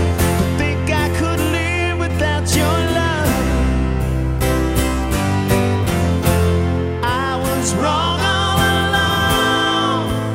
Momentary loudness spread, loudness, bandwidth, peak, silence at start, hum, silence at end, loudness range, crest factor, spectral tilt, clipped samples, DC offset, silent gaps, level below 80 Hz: 4 LU; -17 LUFS; 16.5 kHz; -2 dBFS; 0 s; none; 0 s; 1 LU; 14 dB; -5 dB/octave; under 0.1%; under 0.1%; none; -26 dBFS